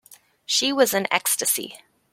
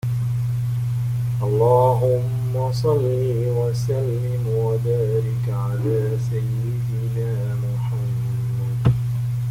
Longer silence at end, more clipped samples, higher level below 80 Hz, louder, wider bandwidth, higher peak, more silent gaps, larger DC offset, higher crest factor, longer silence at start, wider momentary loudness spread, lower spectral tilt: first, 0.35 s vs 0 s; neither; second, -72 dBFS vs -44 dBFS; about the same, -21 LUFS vs -22 LUFS; about the same, 16.5 kHz vs 15.5 kHz; first, -2 dBFS vs -6 dBFS; neither; neither; first, 22 dB vs 14 dB; first, 0.5 s vs 0.05 s; about the same, 5 LU vs 6 LU; second, -1 dB/octave vs -8.5 dB/octave